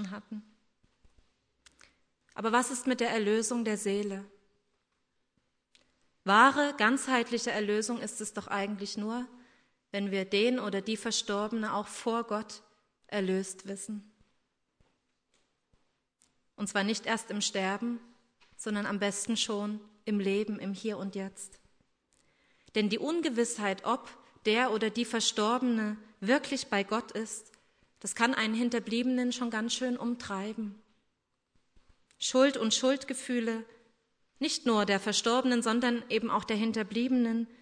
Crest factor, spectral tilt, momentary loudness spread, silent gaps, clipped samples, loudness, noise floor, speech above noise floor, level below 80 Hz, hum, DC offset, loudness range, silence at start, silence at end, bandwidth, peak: 24 dB; -3.5 dB/octave; 12 LU; none; under 0.1%; -31 LUFS; -79 dBFS; 49 dB; -74 dBFS; none; under 0.1%; 7 LU; 0 s; 0.15 s; 11 kHz; -8 dBFS